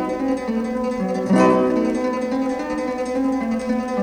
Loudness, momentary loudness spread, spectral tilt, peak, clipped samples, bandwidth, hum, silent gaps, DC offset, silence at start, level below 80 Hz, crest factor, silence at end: -21 LUFS; 8 LU; -7 dB/octave; -4 dBFS; under 0.1%; 11 kHz; none; none; under 0.1%; 0 s; -48 dBFS; 16 dB; 0 s